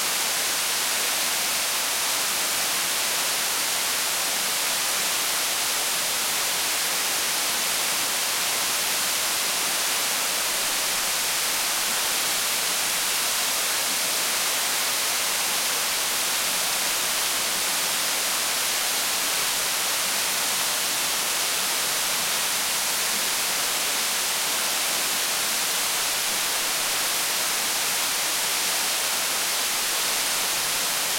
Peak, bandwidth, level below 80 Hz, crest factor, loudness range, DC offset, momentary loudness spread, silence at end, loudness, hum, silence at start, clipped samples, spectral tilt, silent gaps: -10 dBFS; 16.5 kHz; -62 dBFS; 14 dB; 0 LU; under 0.1%; 0 LU; 0 s; -22 LUFS; none; 0 s; under 0.1%; 1.5 dB/octave; none